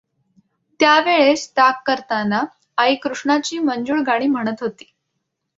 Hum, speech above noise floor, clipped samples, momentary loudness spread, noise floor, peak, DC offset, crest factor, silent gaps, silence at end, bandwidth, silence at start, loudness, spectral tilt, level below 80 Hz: none; 58 dB; under 0.1%; 9 LU; -75 dBFS; -2 dBFS; under 0.1%; 18 dB; none; 0.85 s; 7.8 kHz; 0.8 s; -18 LUFS; -3.5 dB/octave; -64 dBFS